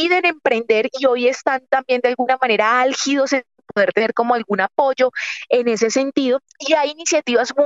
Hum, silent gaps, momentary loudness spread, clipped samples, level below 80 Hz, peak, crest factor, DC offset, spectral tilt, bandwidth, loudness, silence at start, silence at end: none; none; 4 LU; under 0.1%; -70 dBFS; -2 dBFS; 14 dB; under 0.1%; -2.5 dB/octave; 8 kHz; -18 LUFS; 0 s; 0 s